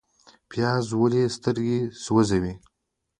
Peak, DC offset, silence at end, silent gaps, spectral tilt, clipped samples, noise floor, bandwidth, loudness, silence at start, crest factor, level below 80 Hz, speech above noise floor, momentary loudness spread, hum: -6 dBFS; under 0.1%; 0.6 s; none; -6.5 dB/octave; under 0.1%; -80 dBFS; 10.5 kHz; -24 LUFS; 0.5 s; 18 dB; -50 dBFS; 57 dB; 10 LU; none